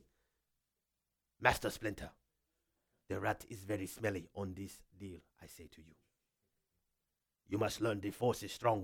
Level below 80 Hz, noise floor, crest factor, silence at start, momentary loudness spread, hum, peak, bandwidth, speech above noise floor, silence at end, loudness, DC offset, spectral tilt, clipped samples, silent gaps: -62 dBFS; -88 dBFS; 30 dB; 1.4 s; 21 LU; none; -12 dBFS; 19 kHz; 49 dB; 0 s; -39 LUFS; under 0.1%; -5 dB/octave; under 0.1%; none